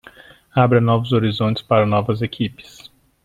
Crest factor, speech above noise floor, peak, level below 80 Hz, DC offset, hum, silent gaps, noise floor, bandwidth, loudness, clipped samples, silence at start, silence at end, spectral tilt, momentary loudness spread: 18 dB; 28 dB; -2 dBFS; -52 dBFS; under 0.1%; none; none; -45 dBFS; 7.4 kHz; -18 LUFS; under 0.1%; 0.55 s; 0.6 s; -8 dB/octave; 9 LU